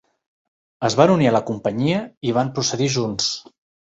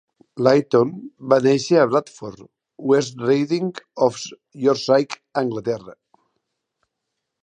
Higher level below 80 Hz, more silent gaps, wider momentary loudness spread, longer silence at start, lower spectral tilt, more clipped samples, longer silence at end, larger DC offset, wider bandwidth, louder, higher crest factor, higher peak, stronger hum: first, -56 dBFS vs -66 dBFS; first, 2.17-2.21 s vs none; second, 9 LU vs 17 LU; first, 0.8 s vs 0.35 s; about the same, -5 dB/octave vs -5.5 dB/octave; neither; second, 0.55 s vs 1.55 s; neither; second, 8 kHz vs 9.8 kHz; about the same, -20 LUFS vs -20 LUFS; about the same, 20 dB vs 20 dB; about the same, -2 dBFS vs -2 dBFS; neither